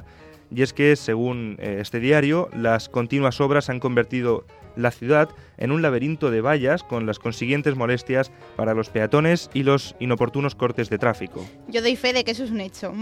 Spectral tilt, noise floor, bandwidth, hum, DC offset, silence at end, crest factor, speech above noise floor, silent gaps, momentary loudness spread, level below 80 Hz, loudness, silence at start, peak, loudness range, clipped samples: -6.5 dB/octave; -46 dBFS; 14.5 kHz; none; under 0.1%; 0 s; 18 dB; 24 dB; none; 9 LU; -56 dBFS; -22 LUFS; 0 s; -4 dBFS; 1 LU; under 0.1%